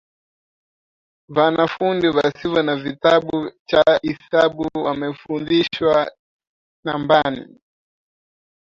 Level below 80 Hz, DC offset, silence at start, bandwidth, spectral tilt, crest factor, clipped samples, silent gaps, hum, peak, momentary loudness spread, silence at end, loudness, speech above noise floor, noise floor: -56 dBFS; under 0.1%; 1.3 s; 7.6 kHz; -6.5 dB/octave; 18 dB; under 0.1%; 3.59-3.65 s, 6.19-6.39 s, 6.47-6.83 s; none; -2 dBFS; 10 LU; 1.2 s; -19 LUFS; over 72 dB; under -90 dBFS